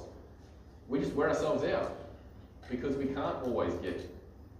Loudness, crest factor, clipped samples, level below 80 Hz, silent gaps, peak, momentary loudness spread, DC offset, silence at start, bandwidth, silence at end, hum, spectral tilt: -34 LUFS; 16 dB; under 0.1%; -54 dBFS; none; -18 dBFS; 23 LU; under 0.1%; 0 s; 14.5 kHz; 0 s; none; -6.5 dB/octave